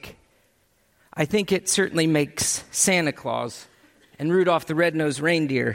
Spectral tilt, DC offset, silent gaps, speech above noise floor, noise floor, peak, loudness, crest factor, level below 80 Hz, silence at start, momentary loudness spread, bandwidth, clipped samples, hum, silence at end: -3.5 dB/octave; under 0.1%; none; 42 dB; -64 dBFS; -6 dBFS; -22 LUFS; 18 dB; -60 dBFS; 0.05 s; 10 LU; 16.5 kHz; under 0.1%; none; 0 s